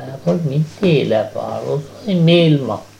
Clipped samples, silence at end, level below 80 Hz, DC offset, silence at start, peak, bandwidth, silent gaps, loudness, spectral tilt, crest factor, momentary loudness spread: under 0.1%; 0.15 s; -56 dBFS; under 0.1%; 0 s; -2 dBFS; 9.6 kHz; none; -16 LUFS; -7.5 dB/octave; 14 dB; 11 LU